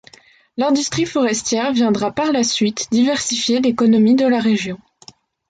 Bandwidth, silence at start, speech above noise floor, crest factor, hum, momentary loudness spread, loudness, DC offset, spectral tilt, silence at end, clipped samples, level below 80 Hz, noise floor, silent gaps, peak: 9.4 kHz; 0.55 s; 32 dB; 12 dB; none; 6 LU; -17 LUFS; under 0.1%; -4 dB/octave; 0.75 s; under 0.1%; -56 dBFS; -48 dBFS; none; -4 dBFS